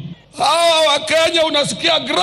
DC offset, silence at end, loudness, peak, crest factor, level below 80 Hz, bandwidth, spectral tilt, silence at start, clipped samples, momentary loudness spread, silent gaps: under 0.1%; 0 s; -14 LUFS; -2 dBFS; 14 dB; -54 dBFS; 15.5 kHz; -2 dB/octave; 0 s; under 0.1%; 5 LU; none